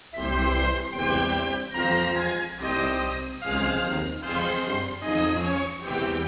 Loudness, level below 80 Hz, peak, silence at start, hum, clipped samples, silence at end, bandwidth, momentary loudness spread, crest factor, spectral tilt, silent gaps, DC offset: -26 LUFS; -36 dBFS; -12 dBFS; 0.05 s; none; under 0.1%; 0 s; 4 kHz; 6 LU; 14 dB; -9 dB/octave; none; under 0.1%